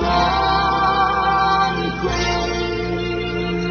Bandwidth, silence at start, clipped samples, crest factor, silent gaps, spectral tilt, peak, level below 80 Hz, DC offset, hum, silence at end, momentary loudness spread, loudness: 6.6 kHz; 0 s; under 0.1%; 14 dB; none; -5 dB/octave; -4 dBFS; -32 dBFS; under 0.1%; none; 0 s; 6 LU; -18 LUFS